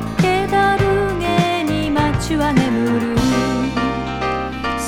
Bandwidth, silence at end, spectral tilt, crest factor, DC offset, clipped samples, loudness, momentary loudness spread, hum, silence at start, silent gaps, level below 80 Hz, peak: 17 kHz; 0 s; -6 dB/octave; 16 dB; under 0.1%; under 0.1%; -18 LUFS; 6 LU; none; 0 s; none; -32 dBFS; 0 dBFS